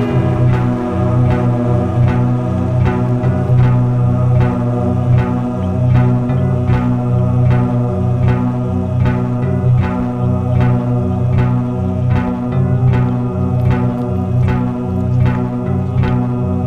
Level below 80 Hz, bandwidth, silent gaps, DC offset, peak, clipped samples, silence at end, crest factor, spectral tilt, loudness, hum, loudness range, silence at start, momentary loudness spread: -30 dBFS; 4.3 kHz; none; under 0.1%; -2 dBFS; under 0.1%; 0 s; 12 dB; -10 dB/octave; -15 LUFS; none; 2 LU; 0 s; 4 LU